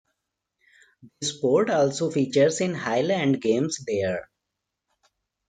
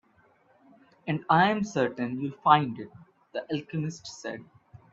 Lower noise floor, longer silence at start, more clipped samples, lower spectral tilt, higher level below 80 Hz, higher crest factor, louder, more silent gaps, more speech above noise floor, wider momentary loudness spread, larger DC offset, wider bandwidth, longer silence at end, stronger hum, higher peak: first, -83 dBFS vs -63 dBFS; about the same, 1.05 s vs 1.05 s; neither; about the same, -5 dB/octave vs -6 dB/octave; about the same, -68 dBFS vs -68 dBFS; second, 16 dB vs 24 dB; first, -24 LUFS vs -27 LUFS; neither; first, 60 dB vs 36 dB; second, 8 LU vs 18 LU; neither; first, 9.6 kHz vs 7.8 kHz; first, 1.25 s vs 0.5 s; neither; second, -8 dBFS vs -4 dBFS